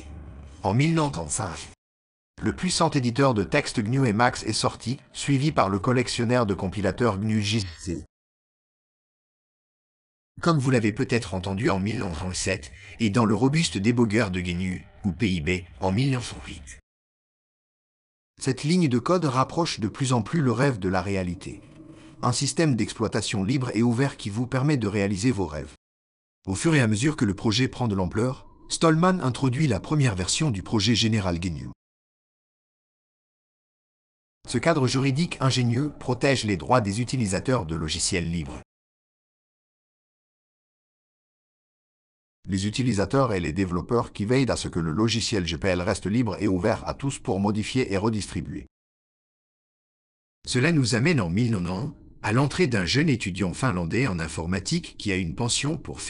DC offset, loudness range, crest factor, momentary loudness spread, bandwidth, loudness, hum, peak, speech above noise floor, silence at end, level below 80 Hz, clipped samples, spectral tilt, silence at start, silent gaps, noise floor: under 0.1%; 6 LU; 20 dB; 10 LU; 11.5 kHz; -25 LUFS; none; -6 dBFS; 22 dB; 0 s; -48 dBFS; under 0.1%; -5.5 dB/octave; 0 s; 1.78-2.34 s, 8.09-10.35 s, 16.83-18.34 s, 25.78-26.42 s, 31.75-34.41 s, 38.65-42.43 s, 48.71-50.42 s; -46 dBFS